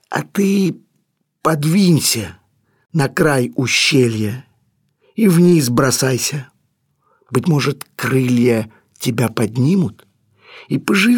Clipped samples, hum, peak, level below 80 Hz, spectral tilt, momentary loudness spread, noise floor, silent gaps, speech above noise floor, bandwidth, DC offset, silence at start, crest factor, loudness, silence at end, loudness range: under 0.1%; none; -2 dBFS; -54 dBFS; -5 dB/octave; 11 LU; -67 dBFS; none; 52 dB; 19 kHz; under 0.1%; 0.1 s; 14 dB; -16 LUFS; 0 s; 3 LU